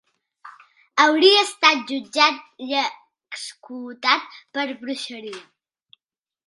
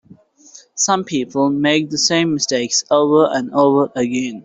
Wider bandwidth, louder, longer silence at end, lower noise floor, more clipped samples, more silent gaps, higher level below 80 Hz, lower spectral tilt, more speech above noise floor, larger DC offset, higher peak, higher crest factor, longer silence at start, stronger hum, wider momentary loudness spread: first, 11.5 kHz vs 8.4 kHz; second, -19 LUFS vs -16 LUFS; first, 1.05 s vs 0.05 s; first, -88 dBFS vs -46 dBFS; neither; neither; second, -80 dBFS vs -60 dBFS; second, -1 dB/octave vs -3.5 dB/octave; first, 67 dB vs 30 dB; neither; about the same, 0 dBFS vs -2 dBFS; first, 22 dB vs 14 dB; second, 0.45 s vs 0.75 s; neither; first, 21 LU vs 6 LU